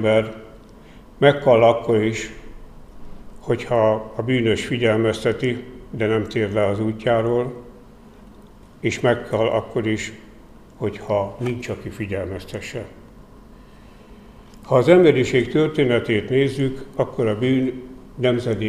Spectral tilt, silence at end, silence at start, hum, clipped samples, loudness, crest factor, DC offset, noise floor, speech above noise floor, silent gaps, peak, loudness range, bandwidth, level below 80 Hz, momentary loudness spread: -6.5 dB/octave; 0 s; 0 s; none; under 0.1%; -20 LUFS; 20 dB; 0.1%; -45 dBFS; 26 dB; none; 0 dBFS; 10 LU; 13.5 kHz; -46 dBFS; 16 LU